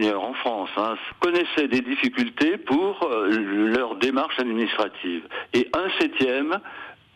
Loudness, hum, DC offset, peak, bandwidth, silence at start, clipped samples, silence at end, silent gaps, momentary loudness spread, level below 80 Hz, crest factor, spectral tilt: -24 LUFS; none; under 0.1%; -12 dBFS; 11 kHz; 0 s; under 0.1%; 0.2 s; none; 6 LU; -62 dBFS; 12 dB; -5 dB/octave